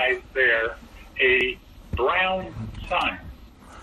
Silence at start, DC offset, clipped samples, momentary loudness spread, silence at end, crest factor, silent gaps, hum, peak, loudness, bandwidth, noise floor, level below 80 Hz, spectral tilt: 0 s; under 0.1%; under 0.1%; 17 LU; 0 s; 16 dB; none; none; -8 dBFS; -22 LUFS; 12.5 kHz; -45 dBFS; -42 dBFS; -5.5 dB/octave